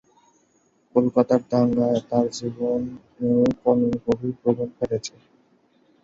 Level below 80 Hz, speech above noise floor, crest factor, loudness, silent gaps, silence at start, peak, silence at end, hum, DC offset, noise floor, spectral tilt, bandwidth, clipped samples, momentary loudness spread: -56 dBFS; 42 dB; 18 dB; -23 LUFS; none; 0.95 s; -4 dBFS; 0.95 s; none; under 0.1%; -63 dBFS; -7 dB/octave; 7.8 kHz; under 0.1%; 8 LU